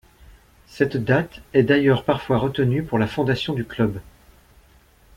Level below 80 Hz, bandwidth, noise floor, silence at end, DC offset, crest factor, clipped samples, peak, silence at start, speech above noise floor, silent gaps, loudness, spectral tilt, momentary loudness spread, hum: -48 dBFS; 15.5 kHz; -54 dBFS; 1.1 s; under 0.1%; 18 dB; under 0.1%; -4 dBFS; 0.7 s; 33 dB; none; -21 LUFS; -7.5 dB/octave; 7 LU; none